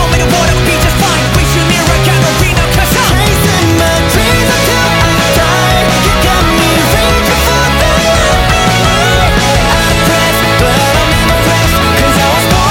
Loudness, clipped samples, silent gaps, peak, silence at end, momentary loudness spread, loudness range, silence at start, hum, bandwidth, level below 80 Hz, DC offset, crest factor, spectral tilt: -8 LUFS; under 0.1%; none; 0 dBFS; 0 s; 1 LU; 0 LU; 0 s; none; 17.5 kHz; -16 dBFS; under 0.1%; 8 dB; -4 dB/octave